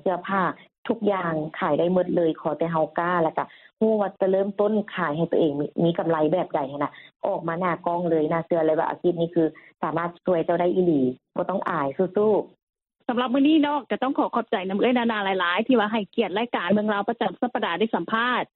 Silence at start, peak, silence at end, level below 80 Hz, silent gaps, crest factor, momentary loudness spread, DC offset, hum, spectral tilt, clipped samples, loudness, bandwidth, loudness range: 0.05 s; -8 dBFS; 0.1 s; -68 dBFS; 0.78-0.83 s, 7.16-7.20 s, 12.63-12.67 s; 14 dB; 6 LU; under 0.1%; none; -10 dB/octave; under 0.1%; -24 LUFS; 4.3 kHz; 2 LU